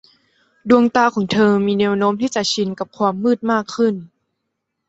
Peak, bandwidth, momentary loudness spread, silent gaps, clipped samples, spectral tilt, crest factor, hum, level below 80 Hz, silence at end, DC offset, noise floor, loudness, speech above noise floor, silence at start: -2 dBFS; 8 kHz; 6 LU; none; under 0.1%; -5 dB/octave; 16 dB; none; -58 dBFS; 0.85 s; under 0.1%; -76 dBFS; -17 LUFS; 59 dB; 0.65 s